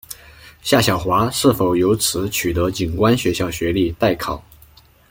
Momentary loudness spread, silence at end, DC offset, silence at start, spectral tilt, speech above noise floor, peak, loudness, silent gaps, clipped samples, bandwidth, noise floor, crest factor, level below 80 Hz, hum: 11 LU; 0.7 s; under 0.1%; 0.1 s; -4.5 dB/octave; 31 dB; -2 dBFS; -18 LUFS; none; under 0.1%; 17 kHz; -49 dBFS; 18 dB; -40 dBFS; none